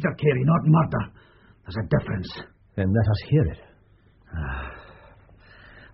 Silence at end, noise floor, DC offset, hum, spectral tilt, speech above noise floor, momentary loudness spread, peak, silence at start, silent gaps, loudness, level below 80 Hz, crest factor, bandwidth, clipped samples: 0.1 s; -57 dBFS; under 0.1%; none; -7.5 dB/octave; 34 dB; 19 LU; -8 dBFS; 0 s; none; -24 LUFS; -42 dBFS; 18 dB; 5.8 kHz; under 0.1%